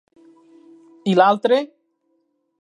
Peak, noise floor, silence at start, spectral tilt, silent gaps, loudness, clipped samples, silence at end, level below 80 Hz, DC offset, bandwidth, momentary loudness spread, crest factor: 0 dBFS; -68 dBFS; 1.05 s; -6.5 dB/octave; none; -18 LUFS; under 0.1%; 0.95 s; -78 dBFS; under 0.1%; 10.5 kHz; 13 LU; 22 dB